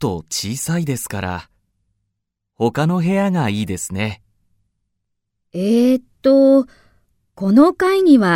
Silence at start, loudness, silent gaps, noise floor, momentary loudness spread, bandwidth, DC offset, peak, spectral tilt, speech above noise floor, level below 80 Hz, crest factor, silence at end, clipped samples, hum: 0 s; -17 LUFS; none; -76 dBFS; 13 LU; 16.5 kHz; under 0.1%; 0 dBFS; -6 dB/octave; 61 dB; -54 dBFS; 16 dB; 0 s; under 0.1%; none